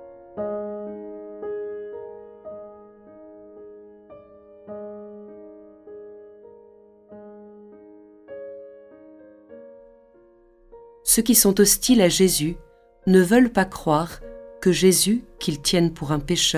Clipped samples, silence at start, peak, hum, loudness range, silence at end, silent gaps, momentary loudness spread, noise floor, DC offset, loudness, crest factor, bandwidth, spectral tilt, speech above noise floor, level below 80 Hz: under 0.1%; 0 s; -4 dBFS; none; 24 LU; 0 s; none; 26 LU; -54 dBFS; under 0.1%; -20 LUFS; 20 dB; 16 kHz; -4 dB/octave; 36 dB; -48 dBFS